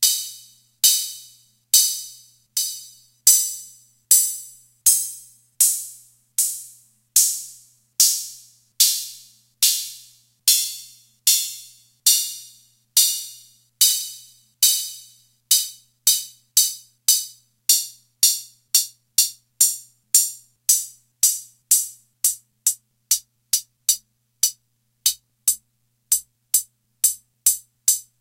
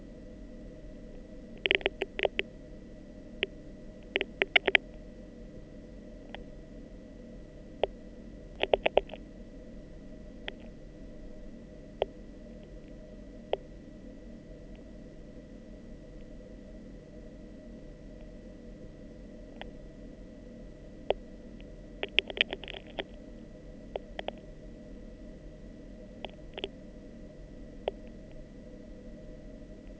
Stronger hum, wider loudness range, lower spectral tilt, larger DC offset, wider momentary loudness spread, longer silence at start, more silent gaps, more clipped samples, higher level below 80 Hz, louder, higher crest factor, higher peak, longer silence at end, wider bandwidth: neither; second, 3 LU vs 17 LU; second, 5.5 dB/octave vs -5 dB/octave; neither; second, 16 LU vs 20 LU; about the same, 0 s vs 0 s; neither; neither; second, -68 dBFS vs -50 dBFS; first, -19 LUFS vs -33 LUFS; second, 22 dB vs 38 dB; about the same, 0 dBFS vs -2 dBFS; first, 0.2 s vs 0 s; first, 16.5 kHz vs 8 kHz